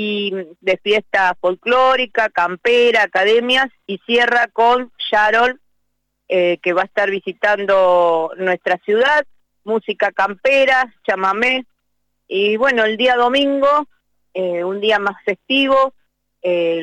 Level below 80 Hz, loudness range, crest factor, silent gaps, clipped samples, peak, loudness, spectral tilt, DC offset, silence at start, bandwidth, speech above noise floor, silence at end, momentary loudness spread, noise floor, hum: -58 dBFS; 2 LU; 10 dB; none; under 0.1%; -6 dBFS; -16 LUFS; -4 dB/octave; under 0.1%; 0 s; 9.8 kHz; 56 dB; 0 s; 9 LU; -72 dBFS; none